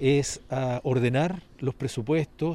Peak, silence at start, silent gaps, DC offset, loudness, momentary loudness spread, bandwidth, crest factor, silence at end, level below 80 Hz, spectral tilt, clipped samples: -10 dBFS; 0 s; none; under 0.1%; -27 LUFS; 8 LU; 12.5 kHz; 16 dB; 0 s; -52 dBFS; -6 dB/octave; under 0.1%